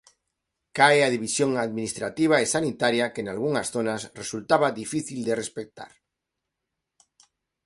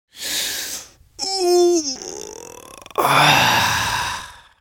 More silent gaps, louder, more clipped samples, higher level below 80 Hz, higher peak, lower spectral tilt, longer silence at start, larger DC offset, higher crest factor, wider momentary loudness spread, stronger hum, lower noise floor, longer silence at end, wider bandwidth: neither; second, -24 LUFS vs -18 LUFS; neither; second, -64 dBFS vs -48 dBFS; second, -4 dBFS vs 0 dBFS; about the same, -3.5 dB/octave vs -2.5 dB/octave; first, 0.75 s vs 0.15 s; neither; about the same, 22 dB vs 20 dB; second, 14 LU vs 21 LU; neither; first, -84 dBFS vs -40 dBFS; first, 1.8 s vs 0.25 s; second, 11.5 kHz vs 17 kHz